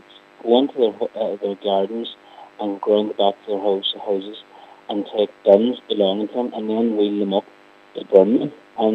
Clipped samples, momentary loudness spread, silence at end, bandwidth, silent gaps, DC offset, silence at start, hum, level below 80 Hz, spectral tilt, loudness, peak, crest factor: under 0.1%; 14 LU; 0 s; 5.2 kHz; none; under 0.1%; 0.45 s; none; -78 dBFS; -8 dB/octave; -20 LUFS; 0 dBFS; 20 dB